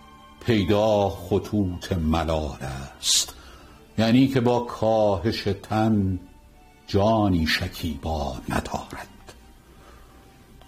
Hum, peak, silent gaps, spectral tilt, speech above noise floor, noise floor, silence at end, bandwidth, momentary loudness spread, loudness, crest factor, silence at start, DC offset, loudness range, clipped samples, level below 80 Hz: none; -6 dBFS; none; -5 dB/octave; 28 dB; -51 dBFS; 0.7 s; 15.5 kHz; 13 LU; -24 LUFS; 18 dB; 0.1 s; under 0.1%; 3 LU; under 0.1%; -40 dBFS